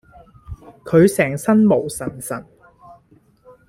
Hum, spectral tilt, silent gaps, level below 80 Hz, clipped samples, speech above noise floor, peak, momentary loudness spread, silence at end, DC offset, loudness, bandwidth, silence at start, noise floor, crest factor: none; -6.5 dB/octave; none; -50 dBFS; under 0.1%; 38 dB; -2 dBFS; 24 LU; 1.25 s; under 0.1%; -17 LUFS; 15.5 kHz; 0.5 s; -54 dBFS; 18 dB